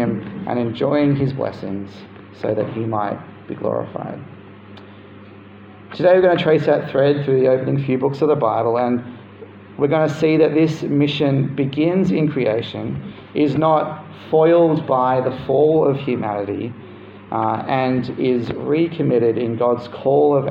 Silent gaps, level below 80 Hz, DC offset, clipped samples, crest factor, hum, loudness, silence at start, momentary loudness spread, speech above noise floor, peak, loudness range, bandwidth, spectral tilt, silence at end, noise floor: none; -56 dBFS; under 0.1%; under 0.1%; 16 dB; none; -18 LUFS; 0 s; 14 LU; 23 dB; -2 dBFS; 8 LU; 7.6 kHz; -8.5 dB/octave; 0 s; -40 dBFS